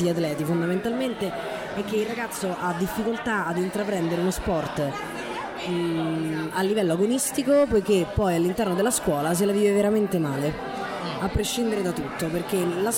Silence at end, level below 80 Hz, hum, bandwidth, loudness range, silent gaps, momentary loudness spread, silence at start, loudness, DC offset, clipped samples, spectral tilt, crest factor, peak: 0 s; -46 dBFS; none; 17 kHz; 5 LU; none; 8 LU; 0 s; -25 LUFS; under 0.1%; under 0.1%; -5 dB/octave; 14 dB; -10 dBFS